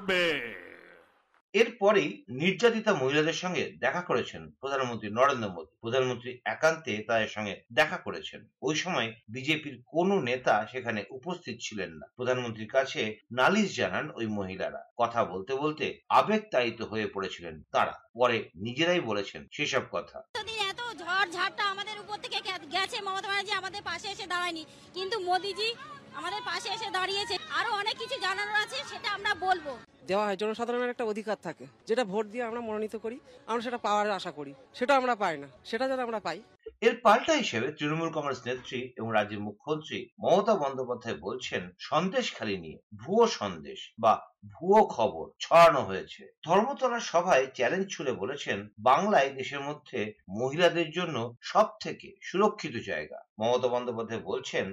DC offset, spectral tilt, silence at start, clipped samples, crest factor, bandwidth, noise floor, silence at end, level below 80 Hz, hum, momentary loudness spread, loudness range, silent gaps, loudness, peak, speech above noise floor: under 0.1%; -4 dB/octave; 0 s; under 0.1%; 18 dB; 15 kHz; -60 dBFS; 0 s; -68 dBFS; none; 13 LU; 6 LU; 1.41-1.53 s, 14.91-14.96 s, 18.09-18.14 s, 20.29-20.34 s, 40.12-40.17 s, 42.83-42.90 s, 46.38-46.42 s, 53.29-53.36 s; -29 LUFS; -10 dBFS; 31 dB